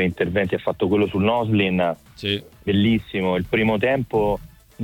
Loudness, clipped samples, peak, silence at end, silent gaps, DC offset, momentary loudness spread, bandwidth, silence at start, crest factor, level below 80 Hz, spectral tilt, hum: -21 LUFS; under 0.1%; -6 dBFS; 0 s; none; under 0.1%; 6 LU; 17 kHz; 0 s; 16 dB; -46 dBFS; -7.5 dB/octave; none